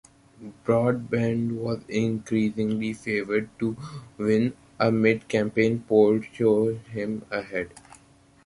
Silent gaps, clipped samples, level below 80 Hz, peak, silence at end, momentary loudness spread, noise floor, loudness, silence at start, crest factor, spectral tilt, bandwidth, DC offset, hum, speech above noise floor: none; under 0.1%; -58 dBFS; -6 dBFS; 0.65 s; 11 LU; -56 dBFS; -25 LUFS; 0.4 s; 20 dB; -7 dB/octave; 11.5 kHz; under 0.1%; none; 32 dB